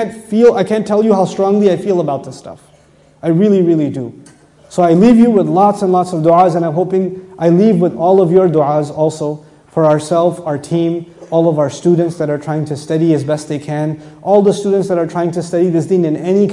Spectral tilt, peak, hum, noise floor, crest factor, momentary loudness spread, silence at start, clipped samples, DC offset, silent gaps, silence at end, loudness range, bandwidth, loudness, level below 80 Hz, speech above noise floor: -8 dB/octave; 0 dBFS; none; -47 dBFS; 12 dB; 11 LU; 0 s; under 0.1%; under 0.1%; none; 0 s; 4 LU; 11.5 kHz; -13 LUFS; -54 dBFS; 35 dB